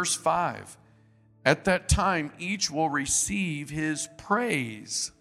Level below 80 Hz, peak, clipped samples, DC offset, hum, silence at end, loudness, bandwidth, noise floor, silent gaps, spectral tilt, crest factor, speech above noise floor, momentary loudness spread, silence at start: -44 dBFS; -4 dBFS; under 0.1%; under 0.1%; none; 0.1 s; -27 LUFS; 15.5 kHz; -59 dBFS; none; -3.5 dB/octave; 24 dB; 32 dB; 7 LU; 0 s